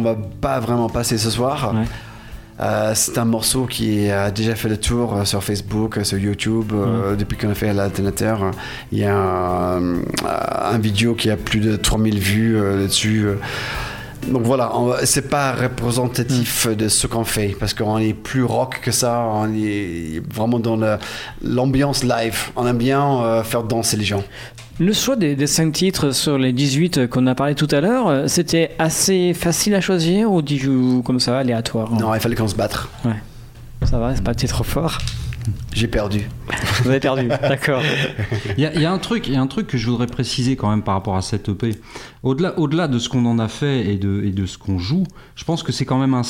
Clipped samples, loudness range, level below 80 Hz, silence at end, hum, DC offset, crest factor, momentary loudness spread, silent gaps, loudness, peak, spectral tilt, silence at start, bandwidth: under 0.1%; 4 LU; -36 dBFS; 0 s; none; under 0.1%; 16 dB; 7 LU; none; -19 LUFS; -2 dBFS; -5 dB/octave; 0 s; 17 kHz